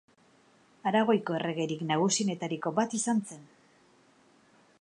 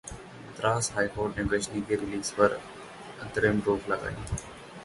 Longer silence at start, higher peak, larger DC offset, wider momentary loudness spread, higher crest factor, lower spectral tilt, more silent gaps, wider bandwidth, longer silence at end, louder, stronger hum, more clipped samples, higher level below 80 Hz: first, 0.85 s vs 0.05 s; second, -12 dBFS vs -8 dBFS; neither; second, 8 LU vs 18 LU; about the same, 20 dB vs 22 dB; about the same, -4.5 dB/octave vs -4.5 dB/octave; neither; about the same, 11 kHz vs 11.5 kHz; first, 1.35 s vs 0 s; about the same, -29 LUFS vs -29 LUFS; neither; neither; second, -80 dBFS vs -48 dBFS